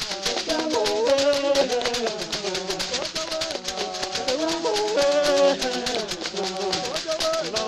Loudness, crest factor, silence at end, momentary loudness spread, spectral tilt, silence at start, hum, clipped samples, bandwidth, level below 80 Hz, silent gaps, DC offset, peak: -23 LUFS; 18 dB; 0 s; 7 LU; -2 dB/octave; 0 s; none; under 0.1%; 15 kHz; -52 dBFS; none; under 0.1%; -6 dBFS